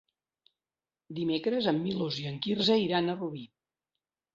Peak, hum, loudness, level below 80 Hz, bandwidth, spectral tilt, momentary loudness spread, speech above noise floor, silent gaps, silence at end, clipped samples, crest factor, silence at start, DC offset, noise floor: -14 dBFS; none; -30 LUFS; -70 dBFS; 7.6 kHz; -6.5 dB/octave; 12 LU; over 60 dB; none; 0.9 s; under 0.1%; 20 dB; 1.1 s; under 0.1%; under -90 dBFS